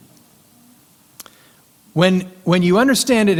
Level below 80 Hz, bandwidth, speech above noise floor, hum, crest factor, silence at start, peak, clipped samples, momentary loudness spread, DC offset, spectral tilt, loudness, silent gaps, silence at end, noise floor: -54 dBFS; 16.5 kHz; 37 dB; none; 18 dB; 1.95 s; 0 dBFS; under 0.1%; 6 LU; under 0.1%; -5 dB/octave; -16 LUFS; none; 0 s; -51 dBFS